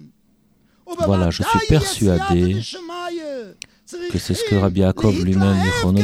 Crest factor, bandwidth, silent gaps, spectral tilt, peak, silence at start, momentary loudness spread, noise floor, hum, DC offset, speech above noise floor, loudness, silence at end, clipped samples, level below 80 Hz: 16 dB; 15 kHz; none; -6 dB/octave; -2 dBFS; 0 s; 15 LU; -58 dBFS; none; under 0.1%; 41 dB; -19 LUFS; 0 s; under 0.1%; -36 dBFS